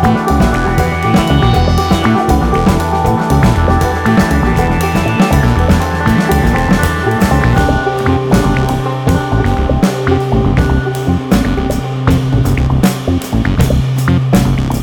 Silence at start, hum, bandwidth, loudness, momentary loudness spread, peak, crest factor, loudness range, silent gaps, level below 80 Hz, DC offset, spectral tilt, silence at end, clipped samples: 0 s; none; 17.5 kHz; -12 LUFS; 3 LU; 0 dBFS; 10 dB; 2 LU; none; -18 dBFS; under 0.1%; -6.5 dB/octave; 0 s; under 0.1%